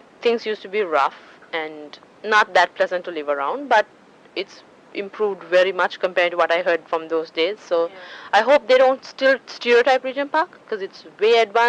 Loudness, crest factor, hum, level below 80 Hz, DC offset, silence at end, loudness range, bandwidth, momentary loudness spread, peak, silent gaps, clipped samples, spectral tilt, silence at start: -20 LUFS; 18 dB; none; -72 dBFS; under 0.1%; 0 s; 3 LU; 9 kHz; 15 LU; -4 dBFS; none; under 0.1%; -3 dB/octave; 0.2 s